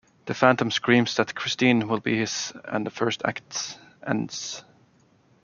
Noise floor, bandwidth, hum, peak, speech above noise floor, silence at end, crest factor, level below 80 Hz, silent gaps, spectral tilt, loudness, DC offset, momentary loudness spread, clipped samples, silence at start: -60 dBFS; 7.4 kHz; none; -2 dBFS; 36 dB; 0.85 s; 24 dB; -66 dBFS; none; -4 dB/octave; -25 LUFS; under 0.1%; 13 LU; under 0.1%; 0.25 s